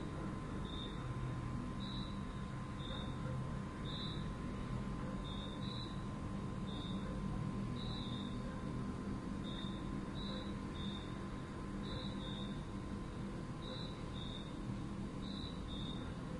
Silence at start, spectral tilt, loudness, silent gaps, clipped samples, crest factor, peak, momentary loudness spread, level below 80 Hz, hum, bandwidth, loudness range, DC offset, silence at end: 0 s; -6.5 dB/octave; -44 LUFS; none; under 0.1%; 14 dB; -30 dBFS; 3 LU; -52 dBFS; none; 11.5 kHz; 2 LU; under 0.1%; 0 s